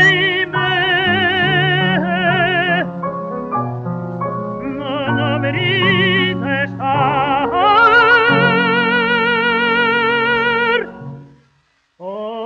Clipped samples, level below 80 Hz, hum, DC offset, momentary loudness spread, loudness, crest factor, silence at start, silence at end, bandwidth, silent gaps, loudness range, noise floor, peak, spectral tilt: under 0.1%; -48 dBFS; none; under 0.1%; 13 LU; -15 LUFS; 14 dB; 0 s; 0 s; 7.4 kHz; none; 6 LU; -60 dBFS; -2 dBFS; -6.5 dB/octave